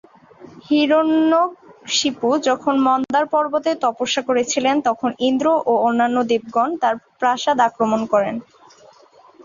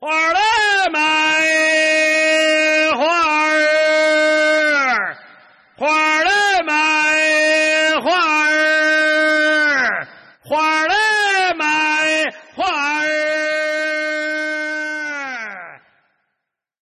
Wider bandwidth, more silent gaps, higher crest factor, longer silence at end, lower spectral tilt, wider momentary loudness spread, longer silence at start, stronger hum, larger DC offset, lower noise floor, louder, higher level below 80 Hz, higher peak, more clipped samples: second, 7.6 kHz vs 12.5 kHz; neither; first, 16 dB vs 8 dB; second, 0 s vs 1.05 s; first, -3.5 dB/octave vs -1 dB/octave; second, 5 LU vs 9 LU; first, 0.4 s vs 0 s; neither; neither; second, -49 dBFS vs -78 dBFS; second, -18 LUFS vs -15 LUFS; about the same, -64 dBFS vs -60 dBFS; first, -4 dBFS vs -8 dBFS; neither